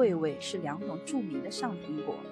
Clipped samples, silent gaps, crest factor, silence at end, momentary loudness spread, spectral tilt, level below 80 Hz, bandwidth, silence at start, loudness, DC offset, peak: under 0.1%; none; 18 dB; 0 s; 5 LU; -5.5 dB/octave; -76 dBFS; 12.5 kHz; 0 s; -34 LUFS; under 0.1%; -16 dBFS